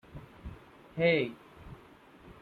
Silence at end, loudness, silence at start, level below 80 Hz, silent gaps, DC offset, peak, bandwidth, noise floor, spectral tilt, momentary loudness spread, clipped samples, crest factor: 0.1 s; -29 LUFS; 0.15 s; -56 dBFS; none; under 0.1%; -14 dBFS; 4.9 kHz; -56 dBFS; -7.5 dB/octave; 26 LU; under 0.1%; 20 dB